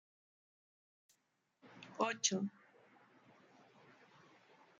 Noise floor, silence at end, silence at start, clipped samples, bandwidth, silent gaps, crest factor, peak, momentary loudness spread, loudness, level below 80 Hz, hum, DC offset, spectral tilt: -82 dBFS; 2.3 s; 1.65 s; under 0.1%; 9.4 kHz; none; 28 dB; -18 dBFS; 23 LU; -38 LUFS; under -90 dBFS; none; under 0.1%; -2.5 dB/octave